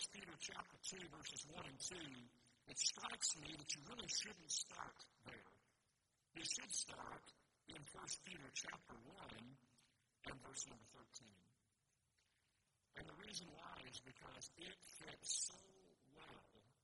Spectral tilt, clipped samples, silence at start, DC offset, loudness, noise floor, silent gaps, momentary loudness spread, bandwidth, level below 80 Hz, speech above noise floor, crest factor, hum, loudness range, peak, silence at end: -0.5 dB/octave; under 0.1%; 0 s; under 0.1%; -49 LUFS; -86 dBFS; none; 19 LU; 11.5 kHz; -80 dBFS; 34 dB; 28 dB; none; 12 LU; -26 dBFS; 0.1 s